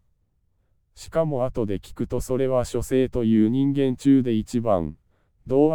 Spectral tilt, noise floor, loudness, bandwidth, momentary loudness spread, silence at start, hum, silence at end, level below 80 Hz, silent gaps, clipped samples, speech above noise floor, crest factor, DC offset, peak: -7.5 dB/octave; -67 dBFS; -23 LUFS; 16.5 kHz; 9 LU; 0 s; none; 0 s; -44 dBFS; none; under 0.1%; 46 dB; 16 dB; under 0.1%; -6 dBFS